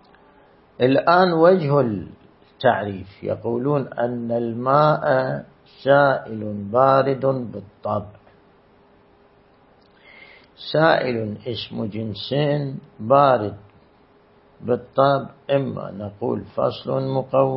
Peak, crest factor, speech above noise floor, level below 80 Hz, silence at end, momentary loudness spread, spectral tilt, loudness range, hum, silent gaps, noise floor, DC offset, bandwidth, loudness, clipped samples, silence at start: -2 dBFS; 20 dB; 34 dB; -60 dBFS; 0 s; 15 LU; -11.5 dB/octave; 6 LU; none; none; -54 dBFS; under 0.1%; 5.8 kHz; -21 LUFS; under 0.1%; 0.8 s